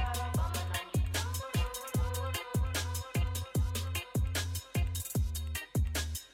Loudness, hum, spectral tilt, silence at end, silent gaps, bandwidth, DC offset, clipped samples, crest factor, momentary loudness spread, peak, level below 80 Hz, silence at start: -35 LUFS; none; -4.5 dB/octave; 0.05 s; none; 16.5 kHz; under 0.1%; under 0.1%; 12 dB; 2 LU; -22 dBFS; -38 dBFS; 0 s